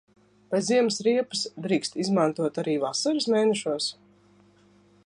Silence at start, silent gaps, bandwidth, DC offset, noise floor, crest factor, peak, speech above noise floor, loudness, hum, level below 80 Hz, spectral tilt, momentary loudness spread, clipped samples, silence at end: 0.5 s; none; 11 kHz; under 0.1%; -59 dBFS; 18 dB; -8 dBFS; 34 dB; -25 LUFS; 50 Hz at -50 dBFS; -74 dBFS; -4 dB/octave; 7 LU; under 0.1%; 1.15 s